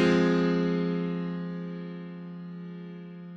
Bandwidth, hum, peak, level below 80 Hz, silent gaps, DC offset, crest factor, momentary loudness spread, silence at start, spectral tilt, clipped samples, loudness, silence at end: 7.6 kHz; none; -12 dBFS; -62 dBFS; none; under 0.1%; 18 dB; 17 LU; 0 s; -7.5 dB/octave; under 0.1%; -29 LUFS; 0 s